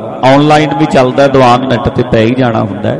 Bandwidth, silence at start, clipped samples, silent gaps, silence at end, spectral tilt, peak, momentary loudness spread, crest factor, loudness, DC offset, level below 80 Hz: 11.5 kHz; 0 s; 0.2%; none; 0 s; -6.5 dB/octave; 0 dBFS; 6 LU; 8 dB; -8 LUFS; under 0.1%; -34 dBFS